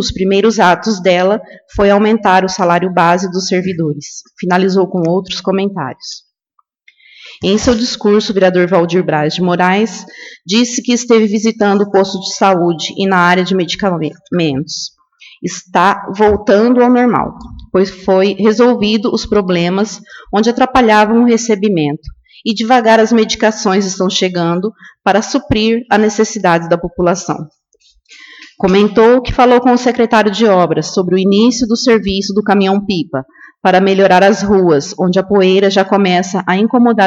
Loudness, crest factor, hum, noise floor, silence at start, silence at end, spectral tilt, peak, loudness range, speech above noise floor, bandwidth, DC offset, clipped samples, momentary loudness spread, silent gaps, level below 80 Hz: -12 LUFS; 12 dB; none; -61 dBFS; 0 s; 0 s; -5 dB/octave; 0 dBFS; 4 LU; 49 dB; 8.2 kHz; under 0.1%; under 0.1%; 10 LU; none; -40 dBFS